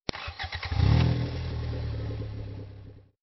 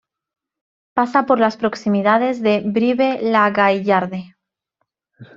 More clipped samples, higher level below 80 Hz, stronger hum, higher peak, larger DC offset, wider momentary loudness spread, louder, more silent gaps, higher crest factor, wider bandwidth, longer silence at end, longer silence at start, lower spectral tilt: neither; first, -38 dBFS vs -62 dBFS; neither; second, -10 dBFS vs -2 dBFS; neither; first, 18 LU vs 6 LU; second, -30 LUFS vs -17 LUFS; neither; about the same, 20 dB vs 18 dB; second, 6 kHz vs 7.4 kHz; about the same, 0.2 s vs 0.15 s; second, 0.1 s vs 0.95 s; about the same, -7.5 dB/octave vs -6.5 dB/octave